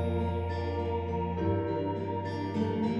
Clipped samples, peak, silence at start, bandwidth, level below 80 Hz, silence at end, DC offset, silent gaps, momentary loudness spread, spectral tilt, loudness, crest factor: under 0.1%; -16 dBFS; 0 s; 7.4 kHz; -46 dBFS; 0 s; under 0.1%; none; 3 LU; -9 dB/octave; -32 LUFS; 14 dB